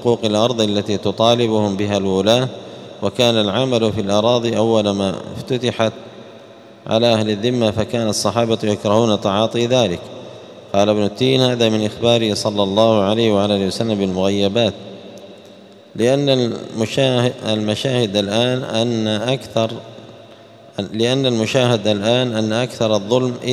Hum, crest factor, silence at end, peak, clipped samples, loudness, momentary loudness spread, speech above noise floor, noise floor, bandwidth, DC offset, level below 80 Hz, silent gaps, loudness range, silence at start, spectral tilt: none; 18 dB; 0 s; 0 dBFS; under 0.1%; -17 LUFS; 10 LU; 25 dB; -42 dBFS; 14.5 kHz; under 0.1%; -56 dBFS; none; 3 LU; 0 s; -5.5 dB/octave